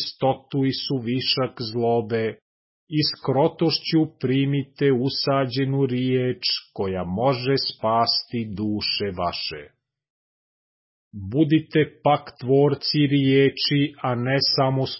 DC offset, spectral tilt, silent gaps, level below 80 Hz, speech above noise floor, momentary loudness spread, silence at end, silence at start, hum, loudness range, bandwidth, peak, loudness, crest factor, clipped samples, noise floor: under 0.1%; -9 dB/octave; 2.42-2.87 s, 10.10-11.11 s; -54 dBFS; over 68 dB; 7 LU; 0 s; 0 s; none; 5 LU; 5.8 kHz; -8 dBFS; -22 LUFS; 16 dB; under 0.1%; under -90 dBFS